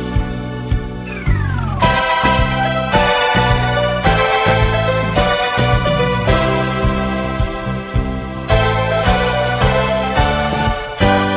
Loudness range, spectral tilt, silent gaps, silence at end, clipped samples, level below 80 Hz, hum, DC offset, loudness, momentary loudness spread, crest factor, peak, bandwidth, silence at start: 3 LU; -10 dB/octave; none; 0 s; under 0.1%; -24 dBFS; none; under 0.1%; -16 LUFS; 8 LU; 14 dB; 0 dBFS; 4 kHz; 0 s